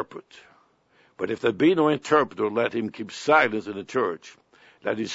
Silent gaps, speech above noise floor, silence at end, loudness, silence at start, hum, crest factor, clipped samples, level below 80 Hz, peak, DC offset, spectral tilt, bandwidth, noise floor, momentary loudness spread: none; 38 dB; 0 s; -24 LUFS; 0 s; none; 20 dB; under 0.1%; -68 dBFS; -4 dBFS; under 0.1%; -5.5 dB/octave; 8 kHz; -62 dBFS; 14 LU